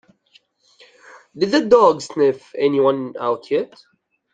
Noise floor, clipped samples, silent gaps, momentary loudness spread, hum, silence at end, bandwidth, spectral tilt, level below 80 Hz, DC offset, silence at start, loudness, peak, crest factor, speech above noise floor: -57 dBFS; under 0.1%; none; 10 LU; none; 0.7 s; 9.2 kHz; -5.5 dB/octave; -64 dBFS; under 0.1%; 1.35 s; -18 LUFS; -2 dBFS; 18 dB; 40 dB